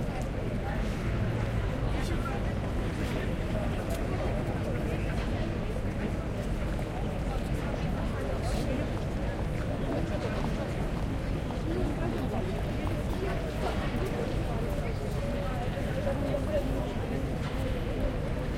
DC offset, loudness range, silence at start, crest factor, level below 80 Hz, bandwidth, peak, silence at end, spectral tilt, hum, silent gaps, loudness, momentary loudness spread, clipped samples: under 0.1%; 1 LU; 0 s; 14 dB; -36 dBFS; 16 kHz; -16 dBFS; 0 s; -7 dB/octave; none; none; -32 LUFS; 2 LU; under 0.1%